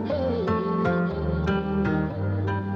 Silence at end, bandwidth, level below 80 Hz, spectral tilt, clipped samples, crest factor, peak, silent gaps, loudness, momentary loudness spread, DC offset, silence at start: 0 s; 6.6 kHz; -40 dBFS; -9.5 dB/octave; under 0.1%; 12 dB; -12 dBFS; none; -25 LUFS; 3 LU; under 0.1%; 0 s